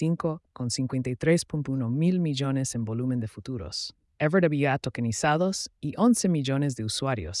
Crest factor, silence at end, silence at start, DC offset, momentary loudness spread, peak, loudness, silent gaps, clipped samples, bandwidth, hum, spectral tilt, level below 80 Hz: 16 dB; 0 s; 0 s; under 0.1%; 10 LU; -10 dBFS; -27 LUFS; none; under 0.1%; 12 kHz; none; -5.5 dB/octave; -56 dBFS